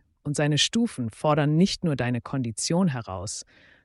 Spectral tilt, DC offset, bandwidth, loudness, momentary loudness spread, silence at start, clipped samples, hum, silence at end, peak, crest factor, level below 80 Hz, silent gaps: -5 dB/octave; under 0.1%; 11.5 kHz; -25 LUFS; 11 LU; 0.25 s; under 0.1%; none; 0.45 s; -10 dBFS; 16 dB; -56 dBFS; none